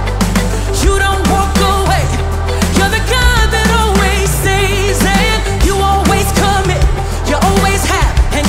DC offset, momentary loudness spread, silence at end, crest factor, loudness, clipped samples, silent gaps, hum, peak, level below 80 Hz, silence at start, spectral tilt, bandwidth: under 0.1%; 4 LU; 0 s; 12 dB; -12 LUFS; under 0.1%; none; none; 0 dBFS; -16 dBFS; 0 s; -4.5 dB/octave; 16.5 kHz